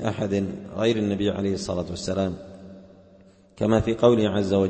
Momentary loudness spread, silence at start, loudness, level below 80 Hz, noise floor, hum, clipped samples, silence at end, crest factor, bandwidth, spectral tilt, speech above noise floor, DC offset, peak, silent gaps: 11 LU; 0 s; -24 LUFS; -48 dBFS; -53 dBFS; none; under 0.1%; 0 s; 20 dB; 8.8 kHz; -6.5 dB/octave; 30 dB; under 0.1%; -6 dBFS; none